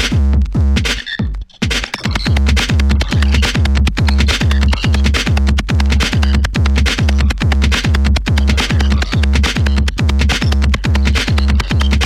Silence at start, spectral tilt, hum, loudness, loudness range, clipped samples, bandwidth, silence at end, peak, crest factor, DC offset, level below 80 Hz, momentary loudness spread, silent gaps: 0 s; -5 dB/octave; none; -14 LUFS; 1 LU; under 0.1%; 12.5 kHz; 0 s; 0 dBFS; 12 dB; under 0.1%; -14 dBFS; 3 LU; none